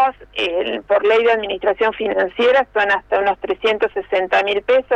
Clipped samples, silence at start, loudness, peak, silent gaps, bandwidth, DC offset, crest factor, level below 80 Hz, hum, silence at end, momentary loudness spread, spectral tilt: under 0.1%; 0 s; -17 LUFS; -4 dBFS; none; 8.4 kHz; under 0.1%; 12 dB; -50 dBFS; 50 Hz at -60 dBFS; 0 s; 5 LU; -4 dB/octave